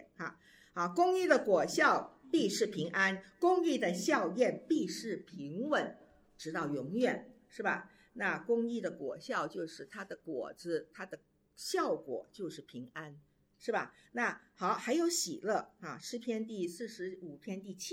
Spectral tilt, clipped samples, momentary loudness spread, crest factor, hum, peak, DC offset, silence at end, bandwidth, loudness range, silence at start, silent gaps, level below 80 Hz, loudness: -4 dB/octave; under 0.1%; 16 LU; 22 dB; none; -14 dBFS; under 0.1%; 0 s; 16.5 kHz; 9 LU; 0 s; none; -78 dBFS; -35 LUFS